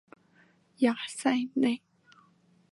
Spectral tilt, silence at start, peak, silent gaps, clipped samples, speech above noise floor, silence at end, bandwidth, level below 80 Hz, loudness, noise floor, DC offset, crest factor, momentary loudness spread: -4 dB/octave; 0.8 s; -12 dBFS; none; under 0.1%; 36 dB; 0.95 s; 11.5 kHz; -84 dBFS; -29 LUFS; -64 dBFS; under 0.1%; 20 dB; 3 LU